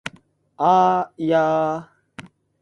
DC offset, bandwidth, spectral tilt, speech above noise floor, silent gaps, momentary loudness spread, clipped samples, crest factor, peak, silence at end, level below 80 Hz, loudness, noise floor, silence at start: under 0.1%; 11.5 kHz; -6.5 dB/octave; 35 dB; none; 12 LU; under 0.1%; 18 dB; -4 dBFS; 0.4 s; -64 dBFS; -19 LUFS; -53 dBFS; 0.05 s